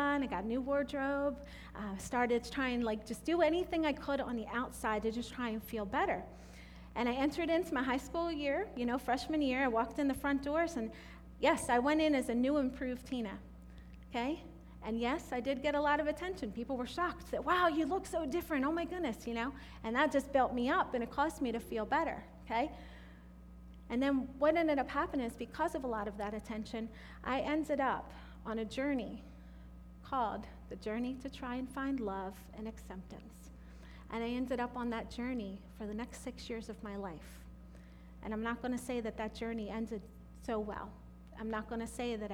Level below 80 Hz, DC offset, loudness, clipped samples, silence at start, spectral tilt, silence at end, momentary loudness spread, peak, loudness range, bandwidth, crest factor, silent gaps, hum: -54 dBFS; under 0.1%; -37 LUFS; under 0.1%; 0 s; -5 dB/octave; 0 s; 20 LU; -18 dBFS; 7 LU; 17.5 kHz; 20 dB; none; none